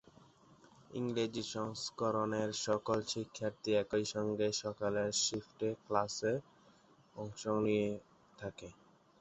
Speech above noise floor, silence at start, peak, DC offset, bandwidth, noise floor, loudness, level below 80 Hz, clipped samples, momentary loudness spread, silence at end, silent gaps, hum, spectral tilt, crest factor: 29 dB; 0.9 s; -16 dBFS; under 0.1%; 8.2 kHz; -66 dBFS; -37 LUFS; -70 dBFS; under 0.1%; 14 LU; 0.5 s; none; none; -4 dB/octave; 22 dB